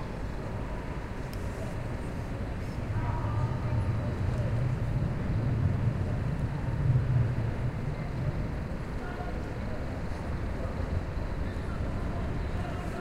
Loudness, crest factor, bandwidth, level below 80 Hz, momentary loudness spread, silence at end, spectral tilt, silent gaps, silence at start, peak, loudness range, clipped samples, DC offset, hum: -33 LUFS; 16 dB; 11.5 kHz; -38 dBFS; 8 LU; 0 s; -8 dB/octave; none; 0 s; -14 dBFS; 5 LU; under 0.1%; under 0.1%; none